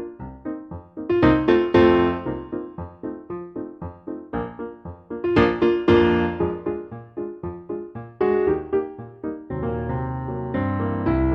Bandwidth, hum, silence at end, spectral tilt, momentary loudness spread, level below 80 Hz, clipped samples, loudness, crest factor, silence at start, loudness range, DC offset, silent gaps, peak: 5.8 kHz; none; 0 s; -9 dB/octave; 18 LU; -40 dBFS; under 0.1%; -22 LUFS; 20 dB; 0 s; 5 LU; under 0.1%; none; -4 dBFS